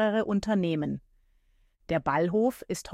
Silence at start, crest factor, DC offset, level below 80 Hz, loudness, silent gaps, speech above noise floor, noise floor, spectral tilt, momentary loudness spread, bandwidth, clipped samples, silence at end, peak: 0 s; 16 dB; under 0.1%; -56 dBFS; -28 LUFS; none; 38 dB; -66 dBFS; -6.5 dB/octave; 9 LU; 15.5 kHz; under 0.1%; 0 s; -14 dBFS